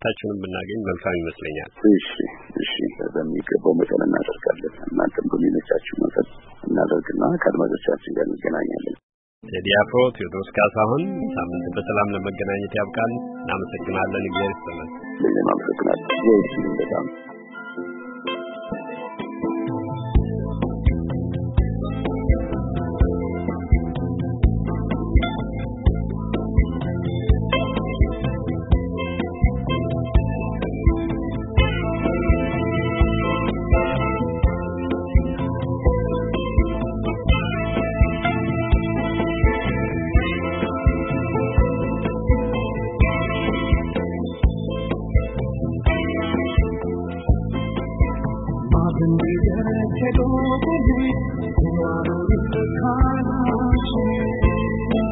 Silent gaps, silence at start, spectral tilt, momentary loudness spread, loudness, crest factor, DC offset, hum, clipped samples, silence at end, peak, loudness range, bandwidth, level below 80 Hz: 9.03-9.41 s; 0 s; -12 dB/octave; 8 LU; -22 LUFS; 18 dB; under 0.1%; none; under 0.1%; 0 s; -4 dBFS; 3 LU; 4 kHz; -28 dBFS